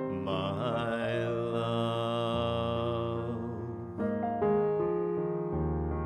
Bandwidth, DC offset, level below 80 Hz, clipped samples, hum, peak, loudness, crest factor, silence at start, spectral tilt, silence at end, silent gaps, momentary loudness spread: 11.5 kHz; under 0.1%; -48 dBFS; under 0.1%; none; -18 dBFS; -32 LUFS; 14 dB; 0 s; -8 dB/octave; 0 s; none; 6 LU